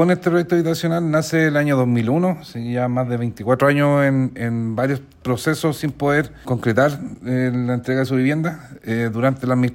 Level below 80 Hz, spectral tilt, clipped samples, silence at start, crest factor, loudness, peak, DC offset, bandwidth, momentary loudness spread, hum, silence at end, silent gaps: -52 dBFS; -7 dB/octave; under 0.1%; 0 s; 16 dB; -19 LUFS; -4 dBFS; under 0.1%; 16.5 kHz; 7 LU; none; 0 s; none